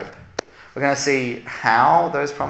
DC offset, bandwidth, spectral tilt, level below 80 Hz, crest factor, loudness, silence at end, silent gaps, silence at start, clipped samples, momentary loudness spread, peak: under 0.1%; 8.6 kHz; -4 dB/octave; -58 dBFS; 18 dB; -19 LUFS; 0 s; none; 0 s; under 0.1%; 18 LU; -2 dBFS